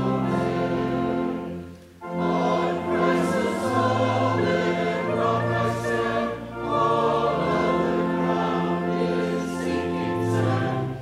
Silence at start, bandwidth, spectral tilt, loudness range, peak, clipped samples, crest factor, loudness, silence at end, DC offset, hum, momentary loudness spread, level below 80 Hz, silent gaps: 0 s; 14 kHz; -7 dB/octave; 2 LU; -10 dBFS; under 0.1%; 14 dB; -24 LUFS; 0 s; under 0.1%; none; 5 LU; -52 dBFS; none